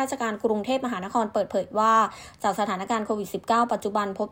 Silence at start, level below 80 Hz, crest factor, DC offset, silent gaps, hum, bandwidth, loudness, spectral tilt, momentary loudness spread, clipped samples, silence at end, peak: 0 s; -62 dBFS; 18 dB; under 0.1%; none; none; 16.5 kHz; -25 LUFS; -4.5 dB/octave; 7 LU; under 0.1%; 0 s; -8 dBFS